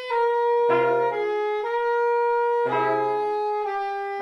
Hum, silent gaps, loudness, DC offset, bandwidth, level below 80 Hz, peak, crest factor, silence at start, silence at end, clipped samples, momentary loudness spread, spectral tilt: none; none; -23 LUFS; under 0.1%; 6.6 kHz; -72 dBFS; -10 dBFS; 12 dB; 0 s; 0 s; under 0.1%; 6 LU; -6 dB/octave